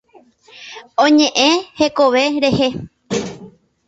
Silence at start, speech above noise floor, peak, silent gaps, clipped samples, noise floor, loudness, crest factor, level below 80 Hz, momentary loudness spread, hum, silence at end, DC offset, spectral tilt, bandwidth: 0.55 s; 35 dB; 0 dBFS; none; under 0.1%; -49 dBFS; -15 LUFS; 16 dB; -50 dBFS; 19 LU; none; 0.4 s; under 0.1%; -4 dB/octave; 8 kHz